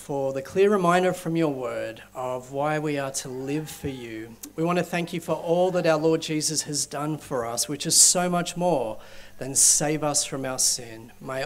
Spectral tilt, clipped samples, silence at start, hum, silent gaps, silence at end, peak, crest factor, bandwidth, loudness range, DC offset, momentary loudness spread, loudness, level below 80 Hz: -3 dB/octave; under 0.1%; 0 s; 50 Hz at -55 dBFS; none; 0 s; -4 dBFS; 20 dB; 16 kHz; 8 LU; under 0.1%; 17 LU; -23 LUFS; -56 dBFS